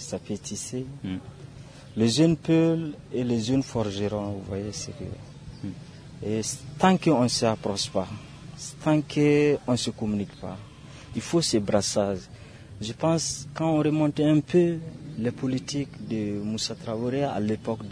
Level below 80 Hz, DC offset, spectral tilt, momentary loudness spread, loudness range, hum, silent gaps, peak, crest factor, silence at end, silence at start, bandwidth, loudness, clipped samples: -54 dBFS; under 0.1%; -5.5 dB/octave; 17 LU; 5 LU; none; none; -6 dBFS; 20 dB; 0 s; 0 s; 11 kHz; -26 LUFS; under 0.1%